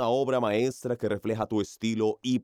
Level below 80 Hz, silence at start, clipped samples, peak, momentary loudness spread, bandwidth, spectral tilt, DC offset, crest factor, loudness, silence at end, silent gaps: -68 dBFS; 0 s; under 0.1%; -14 dBFS; 5 LU; 15.5 kHz; -6 dB/octave; under 0.1%; 14 dB; -28 LUFS; 0 s; none